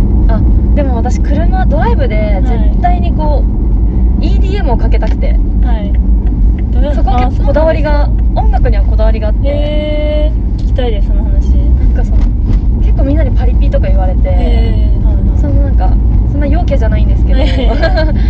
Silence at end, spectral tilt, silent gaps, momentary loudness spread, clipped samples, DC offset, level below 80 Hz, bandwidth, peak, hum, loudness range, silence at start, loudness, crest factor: 0 s; -8.5 dB/octave; none; 2 LU; under 0.1%; under 0.1%; -10 dBFS; 4.8 kHz; 0 dBFS; none; 1 LU; 0 s; -12 LUFS; 8 dB